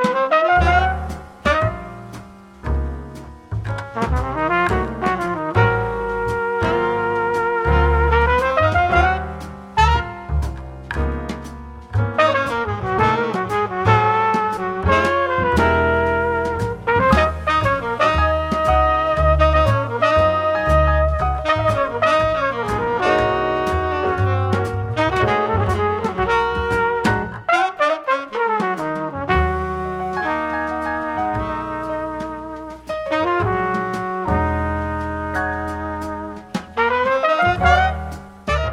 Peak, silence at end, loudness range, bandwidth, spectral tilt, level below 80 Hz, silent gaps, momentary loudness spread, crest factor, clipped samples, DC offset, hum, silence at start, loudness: 0 dBFS; 0 s; 6 LU; 12 kHz; -6.5 dB/octave; -28 dBFS; none; 11 LU; 18 dB; under 0.1%; under 0.1%; none; 0 s; -19 LUFS